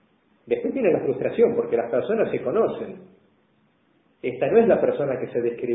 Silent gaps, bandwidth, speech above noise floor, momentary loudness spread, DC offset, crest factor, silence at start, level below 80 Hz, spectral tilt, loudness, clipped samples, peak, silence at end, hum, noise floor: none; 3.9 kHz; 41 dB; 9 LU; under 0.1%; 18 dB; 0.45 s; -62 dBFS; -11.5 dB/octave; -23 LUFS; under 0.1%; -6 dBFS; 0 s; none; -64 dBFS